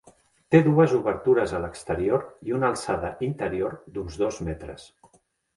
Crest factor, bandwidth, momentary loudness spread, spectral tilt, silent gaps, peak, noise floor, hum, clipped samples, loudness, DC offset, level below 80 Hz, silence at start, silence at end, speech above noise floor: 20 dB; 11.5 kHz; 15 LU; -7 dB/octave; none; -4 dBFS; -64 dBFS; none; under 0.1%; -25 LUFS; under 0.1%; -48 dBFS; 0.5 s; 0.7 s; 39 dB